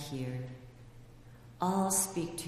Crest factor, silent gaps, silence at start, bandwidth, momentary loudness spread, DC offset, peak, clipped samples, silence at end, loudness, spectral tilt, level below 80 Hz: 20 dB; none; 0 s; 15.5 kHz; 21 LU; under 0.1%; -16 dBFS; under 0.1%; 0 s; -33 LUFS; -4.5 dB/octave; -60 dBFS